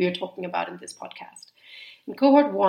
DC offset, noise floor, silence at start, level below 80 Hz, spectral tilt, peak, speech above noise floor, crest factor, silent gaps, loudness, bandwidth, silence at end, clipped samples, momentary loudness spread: under 0.1%; -47 dBFS; 0 s; -80 dBFS; -5.5 dB/octave; -6 dBFS; 24 dB; 18 dB; none; -23 LUFS; 11 kHz; 0 s; under 0.1%; 25 LU